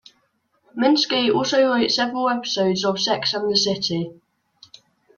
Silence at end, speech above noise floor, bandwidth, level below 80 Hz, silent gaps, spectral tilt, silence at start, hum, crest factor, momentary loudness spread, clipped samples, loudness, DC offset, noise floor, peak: 1.05 s; 46 dB; 7.4 kHz; -64 dBFS; none; -4 dB/octave; 0.75 s; none; 18 dB; 6 LU; under 0.1%; -20 LUFS; under 0.1%; -66 dBFS; -4 dBFS